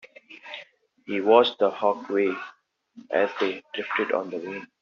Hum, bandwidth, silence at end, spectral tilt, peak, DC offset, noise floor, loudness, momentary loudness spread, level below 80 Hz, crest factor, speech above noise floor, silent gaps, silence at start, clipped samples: none; 7 kHz; 0.15 s; -1.5 dB/octave; -4 dBFS; under 0.1%; -51 dBFS; -25 LUFS; 21 LU; -76 dBFS; 22 dB; 26 dB; none; 0.3 s; under 0.1%